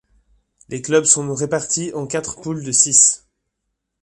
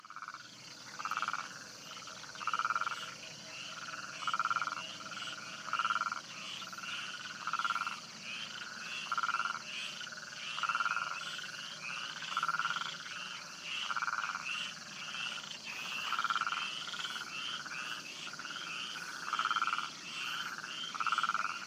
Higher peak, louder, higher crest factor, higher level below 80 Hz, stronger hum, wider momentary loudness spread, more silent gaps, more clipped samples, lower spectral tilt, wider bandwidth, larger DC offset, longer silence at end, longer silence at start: first, 0 dBFS vs -20 dBFS; first, -16 LUFS vs -38 LUFS; about the same, 20 dB vs 20 dB; first, -56 dBFS vs -82 dBFS; neither; first, 16 LU vs 10 LU; neither; neither; first, -2.5 dB/octave vs 0 dB/octave; second, 11.5 kHz vs 15.5 kHz; neither; first, 0.85 s vs 0 s; first, 0.7 s vs 0 s